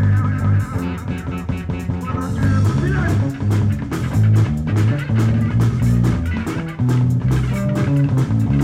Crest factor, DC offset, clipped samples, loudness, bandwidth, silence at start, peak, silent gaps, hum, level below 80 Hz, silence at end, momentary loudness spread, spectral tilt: 12 dB; under 0.1%; under 0.1%; -18 LUFS; 13.5 kHz; 0 s; -6 dBFS; none; none; -30 dBFS; 0 s; 8 LU; -8 dB/octave